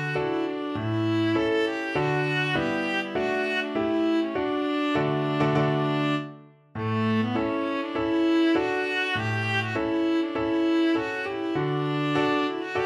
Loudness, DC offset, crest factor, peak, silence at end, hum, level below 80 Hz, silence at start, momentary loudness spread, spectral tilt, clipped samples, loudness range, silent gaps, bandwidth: -25 LUFS; under 0.1%; 14 dB; -12 dBFS; 0 s; none; -58 dBFS; 0 s; 5 LU; -7 dB/octave; under 0.1%; 1 LU; none; 10.5 kHz